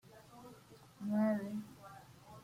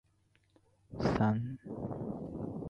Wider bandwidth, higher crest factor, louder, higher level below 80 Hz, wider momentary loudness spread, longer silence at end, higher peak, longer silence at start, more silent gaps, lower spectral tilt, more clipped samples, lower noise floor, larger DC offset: first, 15.5 kHz vs 7.8 kHz; about the same, 16 dB vs 20 dB; about the same, -38 LUFS vs -36 LUFS; second, -76 dBFS vs -56 dBFS; first, 24 LU vs 11 LU; about the same, 0 s vs 0 s; second, -24 dBFS vs -18 dBFS; second, 0.05 s vs 0.9 s; neither; about the same, -7.5 dB/octave vs -8.5 dB/octave; neither; second, -60 dBFS vs -72 dBFS; neither